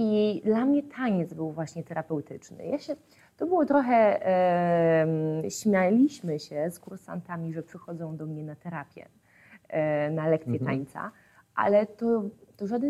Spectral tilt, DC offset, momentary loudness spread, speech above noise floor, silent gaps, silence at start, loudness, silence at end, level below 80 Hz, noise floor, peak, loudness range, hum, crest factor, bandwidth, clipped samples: -7 dB/octave; under 0.1%; 16 LU; 27 dB; none; 0 s; -27 LUFS; 0 s; -72 dBFS; -55 dBFS; -10 dBFS; 10 LU; none; 18 dB; 15 kHz; under 0.1%